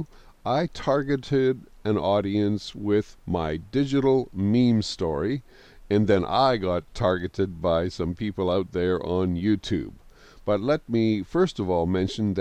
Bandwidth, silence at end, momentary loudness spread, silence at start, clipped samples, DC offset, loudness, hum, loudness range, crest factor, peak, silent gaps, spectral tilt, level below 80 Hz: 9.6 kHz; 0 s; 7 LU; 0 s; under 0.1%; under 0.1%; -25 LUFS; none; 2 LU; 16 dB; -8 dBFS; none; -7 dB/octave; -46 dBFS